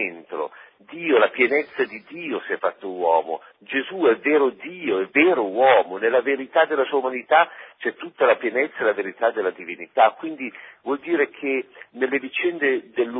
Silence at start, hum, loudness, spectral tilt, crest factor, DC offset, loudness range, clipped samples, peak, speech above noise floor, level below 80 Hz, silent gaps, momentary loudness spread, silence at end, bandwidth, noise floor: 0 s; none; -22 LUFS; -8.5 dB/octave; 20 dB; under 0.1%; 4 LU; under 0.1%; -2 dBFS; 21 dB; -78 dBFS; none; 13 LU; 0 s; 5 kHz; -43 dBFS